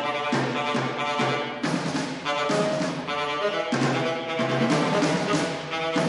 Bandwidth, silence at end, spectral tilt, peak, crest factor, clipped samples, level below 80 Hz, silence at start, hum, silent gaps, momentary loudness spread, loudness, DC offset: 11.5 kHz; 0 s; -5 dB/octave; -10 dBFS; 16 dB; under 0.1%; -62 dBFS; 0 s; none; none; 5 LU; -25 LUFS; under 0.1%